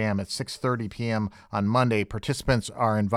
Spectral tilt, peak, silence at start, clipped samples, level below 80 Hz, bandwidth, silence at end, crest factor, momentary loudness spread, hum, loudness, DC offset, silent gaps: -6 dB/octave; -6 dBFS; 0 s; under 0.1%; -46 dBFS; 15 kHz; 0 s; 20 dB; 6 LU; none; -27 LUFS; under 0.1%; none